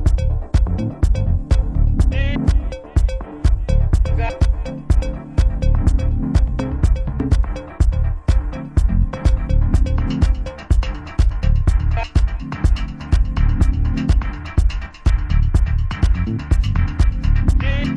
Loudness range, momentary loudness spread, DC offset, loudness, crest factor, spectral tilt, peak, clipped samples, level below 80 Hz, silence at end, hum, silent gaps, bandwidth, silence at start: 1 LU; 4 LU; under 0.1%; -20 LUFS; 12 dB; -7.5 dB/octave; -4 dBFS; under 0.1%; -18 dBFS; 0 s; none; none; 10 kHz; 0 s